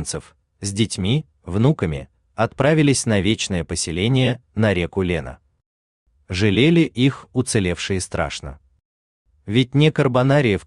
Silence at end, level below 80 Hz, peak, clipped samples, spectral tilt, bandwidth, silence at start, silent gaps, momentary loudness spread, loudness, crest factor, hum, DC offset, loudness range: 0.05 s; -46 dBFS; -4 dBFS; under 0.1%; -5.5 dB/octave; 12 kHz; 0 s; 5.66-6.06 s, 8.85-9.25 s; 12 LU; -20 LUFS; 16 dB; none; under 0.1%; 2 LU